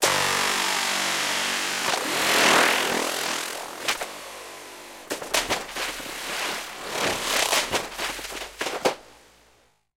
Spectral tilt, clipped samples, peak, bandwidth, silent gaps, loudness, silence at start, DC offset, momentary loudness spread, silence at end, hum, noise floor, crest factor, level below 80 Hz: -0.5 dB/octave; under 0.1%; -4 dBFS; 17 kHz; none; -24 LUFS; 0 s; under 0.1%; 15 LU; 0.85 s; none; -61 dBFS; 22 dB; -56 dBFS